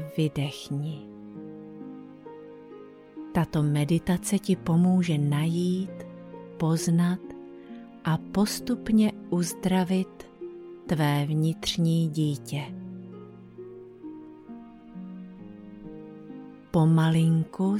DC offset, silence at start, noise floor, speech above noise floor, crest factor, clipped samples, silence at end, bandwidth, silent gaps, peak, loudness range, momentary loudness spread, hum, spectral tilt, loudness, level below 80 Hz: under 0.1%; 0 s; -47 dBFS; 22 dB; 16 dB; under 0.1%; 0 s; 15.5 kHz; none; -12 dBFS; 12 LU; 21 LU; none; -6.5 dB/octave; -26 LUFS; -56 dBFS